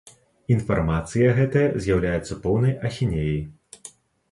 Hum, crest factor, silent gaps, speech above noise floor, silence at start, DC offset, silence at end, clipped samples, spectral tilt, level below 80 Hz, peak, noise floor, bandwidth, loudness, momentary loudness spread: none; 16 dB; none; 26 dB; 0.5 s; under 0.1%; 0.45 s; under 0.1%; -7.5 dB/octave; -40 dBFS; -6 dBFS; -48 dBFS; 11.5 kHz; -23 LUFS; 21 LU